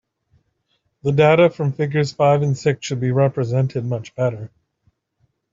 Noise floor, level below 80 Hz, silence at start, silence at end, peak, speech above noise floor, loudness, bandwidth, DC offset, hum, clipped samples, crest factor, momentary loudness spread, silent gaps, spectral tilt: -69 dBFS; -58 dBFS; 1.05 s; 1.05 s; -2 dBFS; 51 dB; -19 LUFS; 7.6 kHz; under 0.1%; none; under 0.1%; 16 dB; 11 LU; none; -7 dB/octave